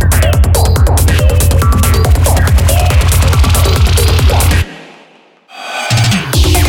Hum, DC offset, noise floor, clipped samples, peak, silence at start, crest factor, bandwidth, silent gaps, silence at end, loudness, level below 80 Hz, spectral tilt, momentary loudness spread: none; under 0.1%; -43 dBFS; under 0.1%; 0 dBFS; 0 s; 8 dB; 18.5 kHz; none; 0 s; -10 LUFS; -12 dBFS; -4.5 dB/octave; 3 LU